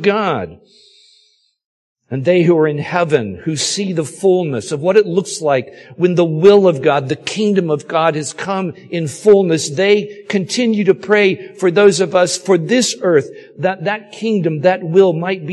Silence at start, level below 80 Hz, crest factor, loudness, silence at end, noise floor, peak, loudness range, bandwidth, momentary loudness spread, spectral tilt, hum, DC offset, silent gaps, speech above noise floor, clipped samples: 0 s; -58 dBFS; 14 dB; -15 LUFS; 0 s; -56 dBFS; 0 dBFS; 3 LU; 12 kHz; 10 LU; -5 dB/octave; none; under 0.1%; 1.66-1.95 s; 42 dB; under 0.1%